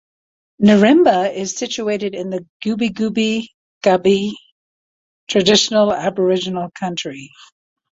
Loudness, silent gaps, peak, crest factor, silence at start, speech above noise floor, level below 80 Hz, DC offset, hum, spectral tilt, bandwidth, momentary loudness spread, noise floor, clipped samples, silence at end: -17 LUFS; 2.49-2.60 s, 3.54-3.81 s, 4.52-5.27 s; 0 dBFS; 16 dB; 0.6 s; over 74 dB; -58 dBFS; under 0.1%; none; -4.5 dB/octave; 7.8 kHz; 14 LU; under -90 dBFS; under 0.1%; 0.65 s